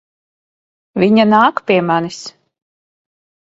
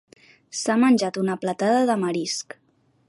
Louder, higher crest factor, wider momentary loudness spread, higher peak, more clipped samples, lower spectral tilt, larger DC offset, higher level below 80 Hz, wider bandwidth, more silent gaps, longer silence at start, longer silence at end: first, -13 LUFS vs -22 LUFS; about the same, 16 dB vs 16 dB; first, 18 LU vs 11 LU; first, 0 dBFS vs -8 dBFS; neither; first, -6 dB/octave vs -4.5 dB/octave; neither; first, -58 dBFS vs -72 dBFS; second, 7.8 kHz vs 11.5 kHz; neither; first, 0.95 s vs 0.55 s; first, 1.2 s vs 0.65 s